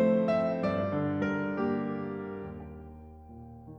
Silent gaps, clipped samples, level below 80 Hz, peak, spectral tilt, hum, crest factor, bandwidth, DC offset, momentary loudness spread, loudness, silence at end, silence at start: none; under 0.1%; -56 dBFS; -16 dBFS; -9 dB/octave; none; 16 dB; 6.6 kHz; under 0.1%; 21 LU; -31 LUFS; 0 s; 0 s